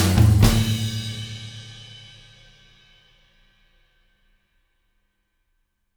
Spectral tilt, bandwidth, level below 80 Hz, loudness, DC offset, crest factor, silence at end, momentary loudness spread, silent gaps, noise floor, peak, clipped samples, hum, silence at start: -5.5 dB/octave; over 20 kHz; -34 dBFS; -20 LUFS; under 0.1%; 22 dB; 4 s; 26 LU; none; -71 dBFS; -2 dBFS; under 0.1%; none; 0 s